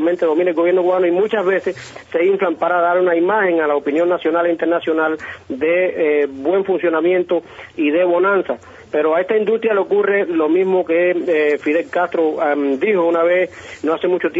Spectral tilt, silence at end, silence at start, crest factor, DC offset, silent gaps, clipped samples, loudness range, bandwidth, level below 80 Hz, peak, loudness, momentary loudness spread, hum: -4 dB/octave; 0 s; 0 s; 12 dB; under 0.1%; none; under 0.1%; 1 LU; 8 kHz; -62 dBFS; -4 dBFS; -17 LUFS; 6 LU; none